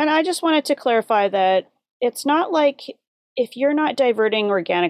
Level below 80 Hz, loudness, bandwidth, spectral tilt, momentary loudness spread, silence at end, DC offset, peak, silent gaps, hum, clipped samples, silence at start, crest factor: -80 dBFS; -19 LUFS; 15 kHz; -4 dB/octave; 8 LU; 0 s; under 0.1%; -6 dBFS; 1.91-2.00 s, 3.07-3.36 s; none; under 0.1%; 0 s; 14 dB